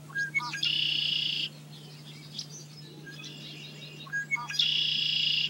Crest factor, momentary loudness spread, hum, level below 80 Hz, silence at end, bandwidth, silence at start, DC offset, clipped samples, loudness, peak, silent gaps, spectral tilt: 18 dB; 21 LU; none; -78 dBFS; 0 s; 16 kHz; 0 s; under 0.1%; under 0.1%; -27 LUFS; -14 dBFS; none; -1.5 dB/octave